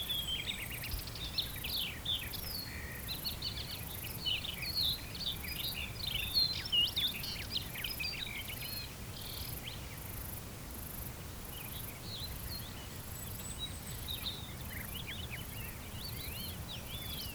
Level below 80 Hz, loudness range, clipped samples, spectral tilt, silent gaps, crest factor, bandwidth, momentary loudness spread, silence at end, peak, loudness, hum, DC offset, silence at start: -50 dBFS; 9 LU; under 0.1%; -2.5 dB/octave; none; 20 dB; over 20 kHz; 11 LU; 0 s; -20 dBFS; -38 LUFS; none; under 0.1%; 0 s